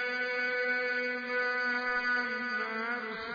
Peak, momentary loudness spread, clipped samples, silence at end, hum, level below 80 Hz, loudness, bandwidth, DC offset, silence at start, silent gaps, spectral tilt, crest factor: -20 dBFS; 4 LU; under 0.1%; 0 s; none; -72 dBFS; -31 LUFS; 5 kHz; under 0.1%; 0 s; none; -3.5 dB/octave; 12 dB